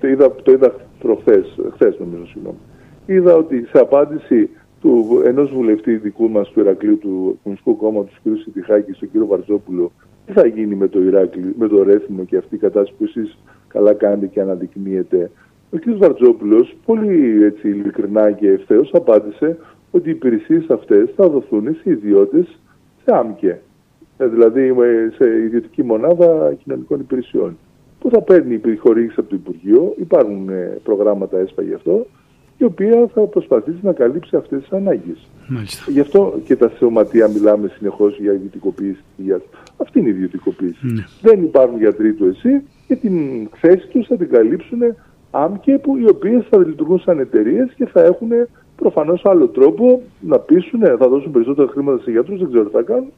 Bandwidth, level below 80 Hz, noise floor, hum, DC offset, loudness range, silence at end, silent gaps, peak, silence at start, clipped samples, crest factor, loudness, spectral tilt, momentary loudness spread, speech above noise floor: 10.5 kHz; -56 dBFS; -50 dBFS; none; under 0.1%; 4 LU; 0.05 s; none; 0 dBFS; 0.05 s; under 0.1%; 14 dB; -15 LUFS; -9 dB/octave; 10 LU; 36 dB